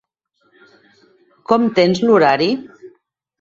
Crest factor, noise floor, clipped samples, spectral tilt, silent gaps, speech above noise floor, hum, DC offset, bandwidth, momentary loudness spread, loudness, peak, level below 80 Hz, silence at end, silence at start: 18 dB; -64 dBFS; under 0.1%; -6 dB/octave; none; 50 dB; none; under 0.1%; 7.6 kHz; 11 LU; -15 LUFS; 0 dBFS; -60 dBFS; 0.55 s; 1.5 s